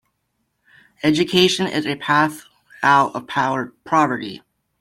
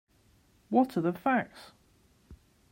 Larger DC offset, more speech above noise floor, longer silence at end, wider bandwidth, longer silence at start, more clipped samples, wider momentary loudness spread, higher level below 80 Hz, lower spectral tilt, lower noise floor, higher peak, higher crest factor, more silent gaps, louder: neither; first, 53 dB vs 36 dB; about the same, 0.45 s vs 0.35 s; about the same, 15.5 kHz vs 16 kHz; first, 1.05 s vs 0.7 s; neither; second, 11 LU vs 15 LU; first, -60 dBFS vs -66 dBFS; second, -4.5 dB/octave vs -7.5 dB/octave; first, -72 dBFS vs -65 dBFS; first, -2 dBFS vs -12 dBFS; about the same, 18 dB vs 22 dB; neither; first, -19 LUFS vs -29 LUFS